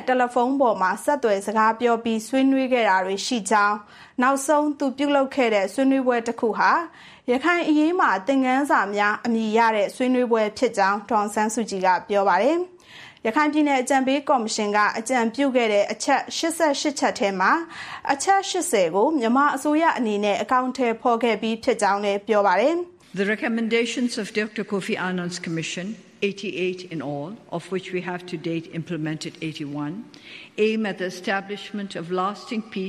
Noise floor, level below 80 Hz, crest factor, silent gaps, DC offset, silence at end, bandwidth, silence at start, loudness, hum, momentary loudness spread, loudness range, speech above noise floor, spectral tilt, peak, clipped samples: -46 dBFS; -70 dBFS; 16 dB; none; under 0.1%; 0 s; 15 kHz; 0 s; -22 LUFS; none; 11 LU; 7 LU; 23 dB; -4 dB/octave; -6 dBFS; under 0.1%